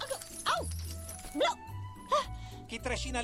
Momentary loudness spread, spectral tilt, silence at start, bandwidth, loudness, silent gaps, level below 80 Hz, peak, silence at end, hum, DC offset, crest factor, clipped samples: 11 LU; -3.5 dB/octave; 0 s; 16 kHz; -35 LUFS; none; -46 dBFS; -18 dBFS; 0 s; none; under 0.1%; 18 dB; under 0.1%